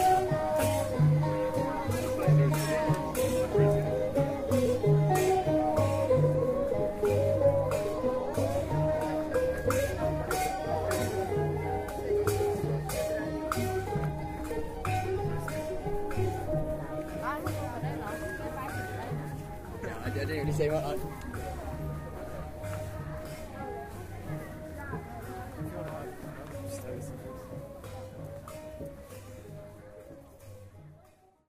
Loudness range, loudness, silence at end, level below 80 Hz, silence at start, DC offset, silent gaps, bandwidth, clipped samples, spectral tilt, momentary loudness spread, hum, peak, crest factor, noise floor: 14 LU; -31 LUFS; 0.5 s; -46 dBFS; 0 s; under 0.1%; none; 15.5 kHz; under 0.1%; -6.5 dB/octave; 17 LU; none; -14 dBFS; 18 dB; -61 dBFS